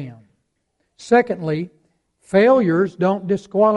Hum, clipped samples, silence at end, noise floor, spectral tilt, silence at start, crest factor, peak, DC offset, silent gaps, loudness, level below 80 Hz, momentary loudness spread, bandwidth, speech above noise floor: none; under 0.1%; 0 s; -71 dBFS; -7.5 dB/octave; 0 s; 16 dB; -2 dBFS; under 0.1%; none; -18 LUFS; -60 dBFS; 12 LU; 11 kHz; 54 dB